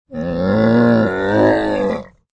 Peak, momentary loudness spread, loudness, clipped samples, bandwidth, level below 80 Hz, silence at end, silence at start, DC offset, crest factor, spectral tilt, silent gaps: -2 dBFS; 9 LU; -15 LUFS; under 0.1%; 8.2 kHz; -42 dBFS; 0.3 s; 0.1 s; under 0.1%; 14 dB; -8.5 dB/octave; none